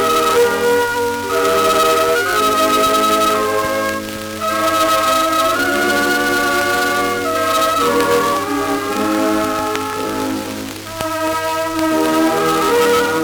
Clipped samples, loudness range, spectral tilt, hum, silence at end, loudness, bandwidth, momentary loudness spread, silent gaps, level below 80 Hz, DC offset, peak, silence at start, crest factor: under 0.1%; 4 LU; -3 dB/octave; none; 0 s; -15 LUFS; over 20 kHz; 7 LU; none; -46 dBFS; under 0.1%; 0 dBFS; 0 s; 16 dB